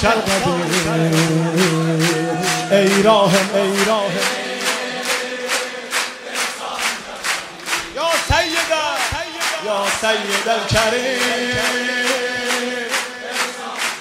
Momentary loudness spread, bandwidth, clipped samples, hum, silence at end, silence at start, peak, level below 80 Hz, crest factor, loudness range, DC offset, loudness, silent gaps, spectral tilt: 7 LU; 16 kHz; under 0.1%; none; 0 s; 0 s; -2 dBFS; -40 dBFS; 18 dB; 5 LU; under 0.1%; -18 LUFS; none; -3.5 dB/octave